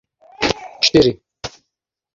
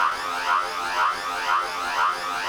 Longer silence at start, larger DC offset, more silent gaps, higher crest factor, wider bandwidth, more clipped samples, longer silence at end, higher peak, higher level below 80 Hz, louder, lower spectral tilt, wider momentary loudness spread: first, 0.4 s vs 0 s; neither; neither; about the same, 18 dB vs 16 dB; second, 7.8 kHz vs over 20 kHz; neither; first, 0.65 s vs 0 s; first, -2 dBFS vs -10 dBFS; first, -44 dBFS vs -58 dBFS; first, -16 LUFS vs -24 LUFS; first, -4 dB/octave vs -0.5 dB/octave; first, 20 LU vs 3 LU